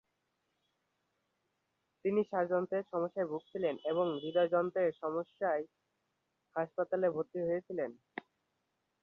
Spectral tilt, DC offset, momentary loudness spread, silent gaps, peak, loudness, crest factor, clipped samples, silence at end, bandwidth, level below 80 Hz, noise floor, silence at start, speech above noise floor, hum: -5 dB/octave; under 0.1%; 9 LU; none; -20 dBFS; -35 LUFS; 18 dB; under 0.1%; 0.85 s; 4.1 kHz; -82 dBFS; -83 dBFS; 2.05 s; 48 dB; none